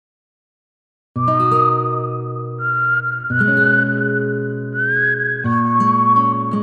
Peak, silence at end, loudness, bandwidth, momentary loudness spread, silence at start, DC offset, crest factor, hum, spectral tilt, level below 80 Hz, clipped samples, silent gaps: -4 dBFS; 0 s; -17 LUFS; 6.8 kHz; 10 LU; 1.15 s; under 0.1%; 14 dB; none; -8.5 dB/octave; -62 dBFS; under 0.1%; none